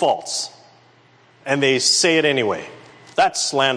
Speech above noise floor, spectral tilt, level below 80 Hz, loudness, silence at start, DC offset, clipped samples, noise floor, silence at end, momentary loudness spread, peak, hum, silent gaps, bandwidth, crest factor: 34 dB; -2 dB/octave; -66 dBFS; -18 LUFS; 0 s; under 0.1%; under 0.1%; -53 dBFS; 0 s; 15 LU; -4 dBFS; none; none; 11 kHz; 16 dB